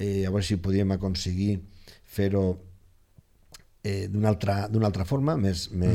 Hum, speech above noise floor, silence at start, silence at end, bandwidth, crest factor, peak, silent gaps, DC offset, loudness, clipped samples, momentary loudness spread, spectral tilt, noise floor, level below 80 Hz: none; 33 dB; 0 s; 0 s; 15 kHz; 18 dB; -10 dBFS; none; under 0.1%; -27 LUFS; under 0.1%; 7 LU; -7 dB/octave; -58 dBFS; -46 dBFS